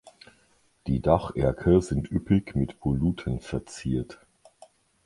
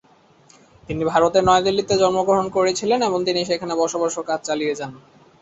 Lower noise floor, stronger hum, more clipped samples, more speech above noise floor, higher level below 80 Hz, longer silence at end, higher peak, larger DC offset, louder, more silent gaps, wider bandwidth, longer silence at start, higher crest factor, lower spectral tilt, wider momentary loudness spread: first, -64 dBFS vs -53 dBFS; neither; neither; first, 39 dB vs 34 dB; first, -40 dBFS vs -52 dBFS; first, 0.9 s vs 0.4 s; second, -6 dBFS vs -2 dBFS; neither; second, -26 LUFS vs -20 LUFS; neither; first, 11.5 kHz vs 8.2 kHz; about the same, 0.85 s vs 0.9 s; about the same, 22 dB vs 18 dB; first, -8 dB/octave vs -4 dB/octave; about the same, 10 LU vs 9 LU